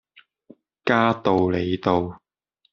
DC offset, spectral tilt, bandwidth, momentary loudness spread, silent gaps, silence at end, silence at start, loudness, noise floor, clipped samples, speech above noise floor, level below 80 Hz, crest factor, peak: under 0.1%; -5 dB/octave; 7 kHz; 8 LU; none; 0.55 s; 0.85 s; -22 LUFS; -70 dBFS; under 0.1%; 49 dB; -58 dBFS; 20 dB; -4 dBFS